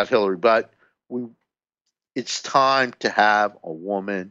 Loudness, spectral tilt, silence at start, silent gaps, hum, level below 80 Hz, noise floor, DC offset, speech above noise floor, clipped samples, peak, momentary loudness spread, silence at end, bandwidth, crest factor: -20 LUFS; -3.5 dB/octave; 0 s; none; none; -70 dBFS; -80 dBFS; under 0.1%; 59 dB; under 0.1%; -2 dBFS; 16 LU; 0 s; 8.2 kHz; 20 dB